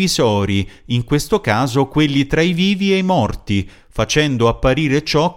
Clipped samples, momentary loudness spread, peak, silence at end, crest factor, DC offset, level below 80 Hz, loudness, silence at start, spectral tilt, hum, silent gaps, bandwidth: under 0.1%; 7 LU; -2 dBFS; 0 s; 14 dB; under 0.1%; -34 dBFS; -16 LUFS; 0 s; -5.5 dB/octave; none; none; 16.5 kHz